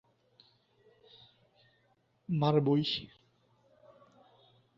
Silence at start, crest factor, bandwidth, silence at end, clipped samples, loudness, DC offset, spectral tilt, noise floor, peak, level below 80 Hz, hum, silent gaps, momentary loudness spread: 2.3 s; 24 dB; 7.2 kHz; 1.7 s; under 0.1%; -31 LUFS; under 0.1%; -8 dB/octave; -72 dBFS; -14 dBFS; -72 dBFS; none; none; 23 LU